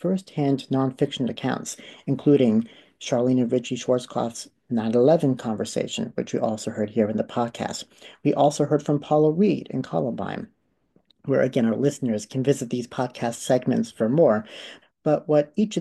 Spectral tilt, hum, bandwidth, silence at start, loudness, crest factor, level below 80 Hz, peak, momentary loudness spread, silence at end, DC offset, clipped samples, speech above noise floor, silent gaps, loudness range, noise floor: -6.5 dB/octave; none; 12.5 kHz; 0.05 s; -24 LUFS; 16 dB; -66 dBFS; -6 dBFS; 12 LU; 0 s; under 0.1%; under 0.1%; 42 dB; none; 2 LU; -65 dBFS